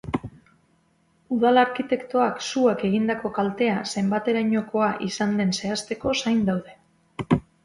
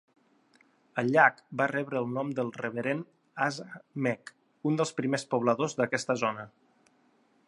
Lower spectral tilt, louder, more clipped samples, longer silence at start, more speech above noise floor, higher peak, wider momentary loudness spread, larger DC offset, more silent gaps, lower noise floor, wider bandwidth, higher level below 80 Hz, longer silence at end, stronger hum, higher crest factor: about the same, -5.5 dB/octave vs -5.5 dB/octave; first, -24 LUFS vs -30 LUFS; neither; second, 0.05 s vs 0.95 s; about the same, 41 dB vs 38 dB; about the same, -6 dBFS vs -8 dBFS; second, 9 LU vs 14 LU; neither; neither; about the same, -64 dBFS vs -67 dBFS; about the same, 11.5 kHz vs 11.5 kHz; first, -54 dBFS vs -78 dBFS; second, 0.25 s vs 1 s; neither; second, 18 dB vs 24 dB